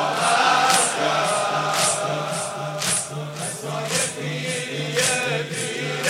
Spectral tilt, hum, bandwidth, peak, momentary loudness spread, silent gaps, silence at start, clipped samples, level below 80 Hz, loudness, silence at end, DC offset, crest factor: -2 dB/octave; none; 16 kHz; -2 dBFS; 10 LU; none; 0 s; under 0.1%; -68 dBFS; -21 LUFS; 0 s; under 0.1%; 22 dB